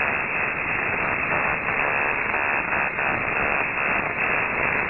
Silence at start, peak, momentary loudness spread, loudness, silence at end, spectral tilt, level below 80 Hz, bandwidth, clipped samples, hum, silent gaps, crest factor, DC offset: 0 s; -6 dBFS; 1 LU; -22 LUFS; 0 s; -3 dB/octave; -48 dBFS; 4 kHz; under 0.1%; none; none; 18 dB; 0.2%